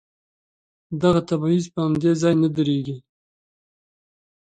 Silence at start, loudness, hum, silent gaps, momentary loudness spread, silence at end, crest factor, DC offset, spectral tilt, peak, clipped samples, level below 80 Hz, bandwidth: 0.9 s; -21 LUFS; none; none; 12 LU; 1.4 s; 18 dB; under 0.1%; -7 dB/octave; -4 dBFS; under 0.1%; -56 dBFS; 9.2 kHz